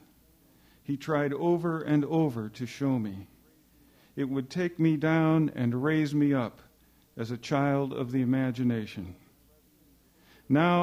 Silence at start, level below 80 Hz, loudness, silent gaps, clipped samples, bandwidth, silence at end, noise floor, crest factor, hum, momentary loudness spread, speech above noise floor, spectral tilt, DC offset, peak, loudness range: 0.9 s; -66 dBFS; -29 LUFS; none; under 0.1%; 16 kHz; 0 s; -62 dBFS; 16 dB; none; 13 LU; 35 dB; -8 dB/octave; under 0.1%; -14 dBFS; 3 LU